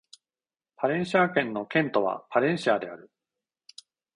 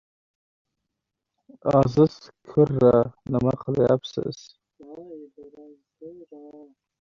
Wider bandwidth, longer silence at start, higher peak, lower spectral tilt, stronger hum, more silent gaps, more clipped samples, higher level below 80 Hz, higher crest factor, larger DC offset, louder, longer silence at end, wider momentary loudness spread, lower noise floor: first, 10.5 kHz vs 7.2 kHz; second, 0.8 s vs 1.65 s; second, -8 dBFS vs -4 dBFS; second, -6 dB/octave vs -8.5 dB/octave; neither; neither; neither; second, -70 dBFS vs -54 dBFS; about the same, 20 dB vs 20 dB; neither; second, -26 LUFS vs -22 LUFS; first, 1.1 s vs 0.55 s; second, 7 LU vs 25 LU; first, under -90 dBFS vs -84 dBFS